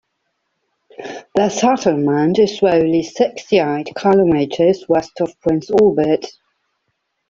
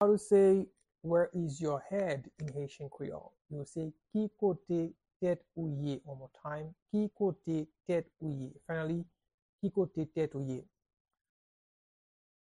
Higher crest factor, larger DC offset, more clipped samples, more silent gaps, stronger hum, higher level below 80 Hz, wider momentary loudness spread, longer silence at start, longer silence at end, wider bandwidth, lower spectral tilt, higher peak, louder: about the same, 14 dB vs 18 dB; neither; neither; second, none vs 5.16-5.20 s, 6.82-6.86 s, 9.34-9.59 s; neither; first, -54 dBFS vs -70 dBFS; second, 8 LU vs 13 LU; first, 1 s vs 0 s; second, 1 s vs 1.95 s; second, 7.6 kHz vs 10.5 kHz; second, -6 dB/octave vs -8 dB/octave; first, -2 dBFS vs -16 dBFS; first, -16 LUFS vs -35 LUFS